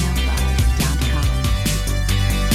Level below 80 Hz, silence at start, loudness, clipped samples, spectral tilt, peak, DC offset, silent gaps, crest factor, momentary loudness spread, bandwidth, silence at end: -20 dBFS; 0 s; -19 LUFS; under 0.1%; -4.5 dB/octave; -6 dBFS; under 0.1%; none; 12 dB; 2 LU; 16 kHz; 0 s